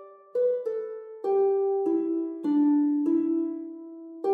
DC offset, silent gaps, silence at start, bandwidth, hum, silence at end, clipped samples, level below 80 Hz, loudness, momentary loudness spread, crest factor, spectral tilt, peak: under 0.1%; none; 0 s; 4.4 kHz; none; 0 s; under 0.1%; under -90 dBFS; -26 LUFS; 15 LU; 10 dB; -9 dB/octave; -16 dBFS